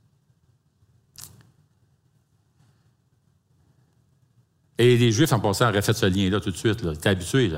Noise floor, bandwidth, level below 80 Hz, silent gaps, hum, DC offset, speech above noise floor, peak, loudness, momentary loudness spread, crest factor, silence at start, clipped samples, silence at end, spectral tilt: -65 dBFS; 16 kHz; -54 dBFS; none; none; under 0.1%; 44 dB; -4 dBFS; -22 LUFS; 25 LU; 20 dB; 1.2 s; under 0.1%; 0 s; -5.5 dB/octave